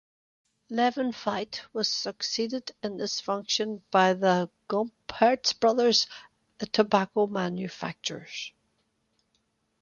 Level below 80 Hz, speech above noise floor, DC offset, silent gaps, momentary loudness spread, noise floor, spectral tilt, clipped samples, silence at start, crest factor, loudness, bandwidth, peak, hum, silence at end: -70 dBFS; 47 dB; under 0.1%; none; 12 LU; -74 dBFS; -3.5 dB/octave; under 0.1%; 0.7 s; 22 dB; -27 LUFS; 7.4 kHz; -6 dBFS; none; 1.3 s